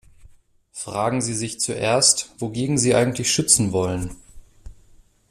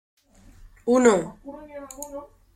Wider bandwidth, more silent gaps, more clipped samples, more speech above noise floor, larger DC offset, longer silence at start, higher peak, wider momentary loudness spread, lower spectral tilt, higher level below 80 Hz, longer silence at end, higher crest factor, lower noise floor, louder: first, 15 kHz vs 13.5 kHz; neither; neither; about the same, 31 dB vs 28 dB; neither; second, 0.25 s vs 0.85 s; about the same, -2 dBFS vs -4 dBFS; second, 14 LU vs 22 LU; about the same, -3.5 dB/octave vs -4.5 dB/octave; first, -48 dBFS vs -54 dBFS; first, 0.6 s vs 0.3 s; about the same, 22 dB vs 22 dB; about the same, -52 dBFS vs -50 dBFS; about the same, -20 LUFS vs -21 LUFS